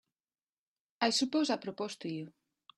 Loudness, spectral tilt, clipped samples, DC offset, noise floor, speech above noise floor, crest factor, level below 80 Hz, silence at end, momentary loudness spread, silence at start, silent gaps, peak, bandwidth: -34 LUFS; -3.5 dB/octave; under 0.1%; under 0.1%; under -90 dBFS; over 57 dB; 24 dB; -80 dBFS; 0.5 s; 12 LU; 1 s; none; -14 dBFS; 12 kHz